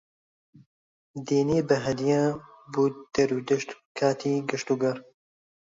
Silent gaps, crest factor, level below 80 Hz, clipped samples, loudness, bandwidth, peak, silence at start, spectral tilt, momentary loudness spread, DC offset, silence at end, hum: 3.86-3.95 s; 18 dB; -62 dBFS; under 0.1%; -26 LUFS; 7.8 kHz; -8 dBFS; 1.15 s; -6 dB/octave; 12 LU; under 0.1%; 0.75 s; none